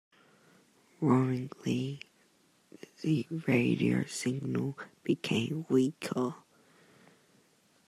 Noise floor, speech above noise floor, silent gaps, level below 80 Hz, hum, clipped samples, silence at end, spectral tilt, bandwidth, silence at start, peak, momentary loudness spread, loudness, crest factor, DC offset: -68 dBFS; 37 dB; none; -74 dBFS; none; under 0.1%; 1.5 s; -6.5 dB/octave; 13.5 kHz; 1 s; -14 dBFS; 11 LU; -32 LUFS; 20 dB; under 0.1%